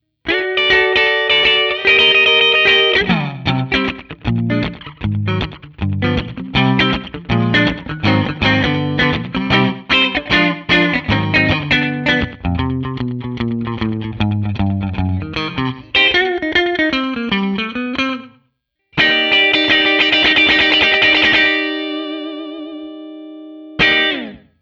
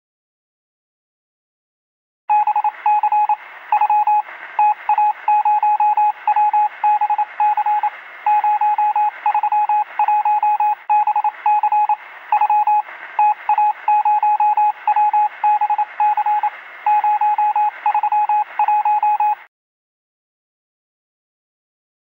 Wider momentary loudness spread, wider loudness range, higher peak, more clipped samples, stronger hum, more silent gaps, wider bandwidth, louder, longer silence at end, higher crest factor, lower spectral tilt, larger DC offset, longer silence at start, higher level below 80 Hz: first, 14 LU vs 5 LU; first, 8 LU vs 4 LU; first, 0 dBFS vs -6 dBFS; neither; neither; neither; first, 7.6 kHz vs 4 kHz; first, -14 LUFS vs -17 LUFS; second, 0.25 s vs 2.65 s; about the same, 16 dB vs 12 dB; first, -6 dB/octave vs -1.5 dB/octave; neither; second, 0.25 s vs 2.3 s; first, -38 dBFS vs -82 dBFS